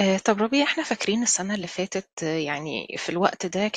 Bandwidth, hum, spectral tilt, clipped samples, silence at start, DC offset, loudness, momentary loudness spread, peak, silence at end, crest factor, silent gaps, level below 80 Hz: 9.8 kHz; none; -3.5 dB/octave; under 0.1%; 0 s; under 0.1%; -25 LUFS; 8 LU; -4 dBFS; 0 s; 20 dB; 2.13-2.17 s; -64 dBFS